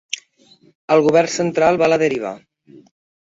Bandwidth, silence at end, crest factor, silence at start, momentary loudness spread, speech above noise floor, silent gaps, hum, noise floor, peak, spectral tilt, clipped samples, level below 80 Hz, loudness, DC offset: 8 kHz; 0.95 s; 18 dB; 0.9 s; 15 LU; 36 dB; none; none; -53 dBFS; -2 dBFS; -4.5 dB/octave; under 0.1%; -58 dBFS; -16 LUFS; under 0.1%